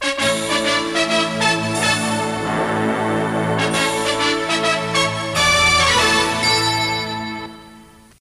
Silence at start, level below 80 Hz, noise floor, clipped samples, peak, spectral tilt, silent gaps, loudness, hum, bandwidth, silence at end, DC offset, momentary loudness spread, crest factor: 0 s; -46 dBFS; -44 dBFS; under 0.1%; -4 dBFS; -3 dB/octave; none; -17 LUFS; none; 16 kHz; 0.4 s; under 0.1%; 8 LU; 14 dB